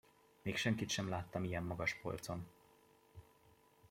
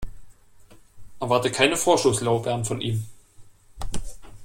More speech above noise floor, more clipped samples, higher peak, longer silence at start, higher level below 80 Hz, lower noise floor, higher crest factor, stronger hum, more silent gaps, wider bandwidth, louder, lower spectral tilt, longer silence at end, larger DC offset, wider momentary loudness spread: about the same, 29 dB vs 27 dB; neither; second, -22 dBFS vs -2 dBFS; first, 0.45 s vs 0 s; second, -68 dBFS vs -42 dBFS; first, -69 dBFS vs -49 dBFS; about the same, 22 dB vs 22 dB; neither; neither; about the same, 16.5 kHz vs 16.5 kHz; second, -41 LUFS vs -23 LUFS; about the same, -4.5 dB/octave vs -4 dB/octave; about the same, 0.05 s vs 0 s; neither; first, 22 LU vs 19 LU